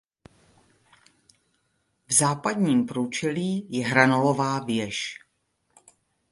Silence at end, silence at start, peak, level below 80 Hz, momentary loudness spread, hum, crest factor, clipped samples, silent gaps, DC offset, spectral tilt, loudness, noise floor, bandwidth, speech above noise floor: 1.15 s; 2.1 s; -2 dBFS; -66 dBFS; 10 LU; none; 26 dB; under 0.1%; none; under 0.1%; -4 dB/octave; -24 LUFS; -73 dBFS; 11.5 kHz; 49 dB